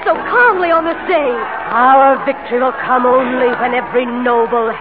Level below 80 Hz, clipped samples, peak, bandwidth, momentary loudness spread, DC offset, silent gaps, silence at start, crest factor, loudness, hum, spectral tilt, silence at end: -52 dBFS; under 0.1%; -2 dBFS; 4.9 kHz; 7 LU; 0.6%; none; 0 s; 12 dB; -13 LUFS; none; -10 dB/octave; 0 s